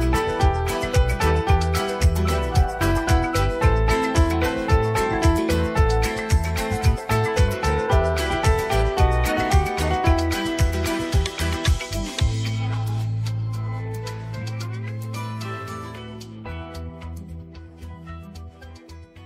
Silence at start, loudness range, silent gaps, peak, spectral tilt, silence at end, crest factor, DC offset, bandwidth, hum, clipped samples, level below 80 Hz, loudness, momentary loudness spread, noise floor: 0 s; 12 LU; none; -6 dBFS; -5.5 dB/octave; 0 s; 16 dB; under 0.1%; 16 kHz; none; under 0.1%; -26 dBFS; -22 LUFS; 16 LU; -42 dBFS